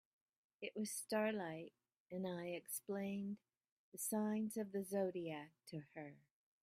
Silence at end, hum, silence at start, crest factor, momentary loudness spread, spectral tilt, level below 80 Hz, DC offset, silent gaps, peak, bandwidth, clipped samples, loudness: 0.45 s; none; 0.6 s; 18 dB; 14 LU; -5 dB/octave; -88 dBFS; under 0.1%; 2.00-2.06 s, 3.71-3.92 s; -28 dBFS; 15.5 kHz; under 0.1%; -45 LUFS